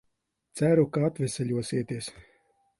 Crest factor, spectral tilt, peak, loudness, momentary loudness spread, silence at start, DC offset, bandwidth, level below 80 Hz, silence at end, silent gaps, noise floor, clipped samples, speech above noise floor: 18 dB; -6.5 dB/octave; -10 dBFS; -27 LUFS; 14 LU; 0.55 s; under 0.1%; 11.5 kHz; -62 dBFS; 0.6 s; none; -77 dBFS; under 0.1%; 51 dB